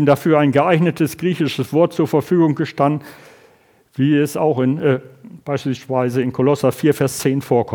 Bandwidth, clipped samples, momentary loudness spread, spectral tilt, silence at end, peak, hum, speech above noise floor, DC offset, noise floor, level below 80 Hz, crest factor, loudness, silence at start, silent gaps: 20 kHz; under 0.1%; 8 LU; -7 dB/octave; 0 s; 0 dBFS; none; 36 dB; under 0.1%; -53 dBFS; -60 dBFS; 16 dB; -17 LUFS; 0 s; none